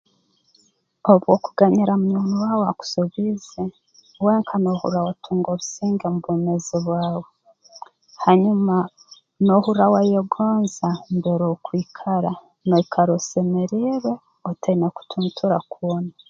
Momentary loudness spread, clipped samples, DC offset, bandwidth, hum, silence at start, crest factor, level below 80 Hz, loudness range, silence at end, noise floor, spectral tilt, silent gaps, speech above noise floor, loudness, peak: 10 LU; under 0.1%; under 0.1%; 7.6 kHz; none; 1.05 s; 20 dB; -62 dBFS; 4 LU; 0.2 s; -63 dBFS; -7 dB/octave; none; 44 dB; -21 LUFS; 0 dBFS